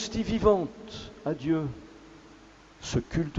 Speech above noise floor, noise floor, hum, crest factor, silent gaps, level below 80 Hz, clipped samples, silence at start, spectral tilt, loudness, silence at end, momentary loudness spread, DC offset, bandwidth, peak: 25 dB; -53 dBFS; none; 20 dB; none; -46 dBFS; under 0.1%; 0 s; -6 dB/octave; -29 LUFS; 0 s; 18 LU; under 0.1%; 8 kHz; -10 dBFS